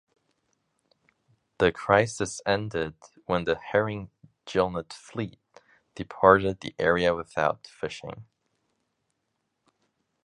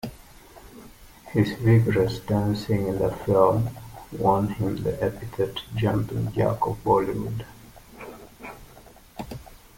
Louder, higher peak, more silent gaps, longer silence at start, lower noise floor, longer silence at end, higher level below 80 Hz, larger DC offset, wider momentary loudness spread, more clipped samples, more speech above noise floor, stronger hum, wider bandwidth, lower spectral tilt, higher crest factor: about the same, -26 LUFS vs -24 LUFS; about the same, -2 dBFS vs -4 dBFS; neither; first, 1.6 s vs 0.05 s; first, -79 dBFS vs -49 dBFS; first, 2 s vs 0.2 s; second, -54 dBFS vs -46 dBFS; neither; second, 18 LU vs 22 LU; neither; first, 53 dB vs 26 dB; neither; second, 11.5 kHz vs 17 kHz; second, -5 dB/octave vs -7.5 dB/octave; about the same, 26 dB vs 22 dB